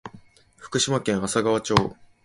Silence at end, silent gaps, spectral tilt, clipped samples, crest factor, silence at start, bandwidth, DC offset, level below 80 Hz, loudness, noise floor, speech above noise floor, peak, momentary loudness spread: 0.3 s; none; -4 dB/octave; under 0.1%; 24 dB; 0.05 s; 11.5 kHz; under 0.1%; -50 dBFS; -23 LUFS; -50 dBFS; 28 dB; 0 dBFS; 10 LU